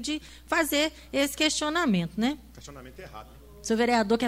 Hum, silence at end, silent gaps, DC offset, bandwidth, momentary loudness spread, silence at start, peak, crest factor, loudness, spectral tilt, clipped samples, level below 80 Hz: none; 0 s; none; under 0.1%; 16 kHz; 21 LU; 0 s; -10 dBFS; 18 dB; -26 LUFS; -3.5 dB/octave; under 0.1%; -52 dBFS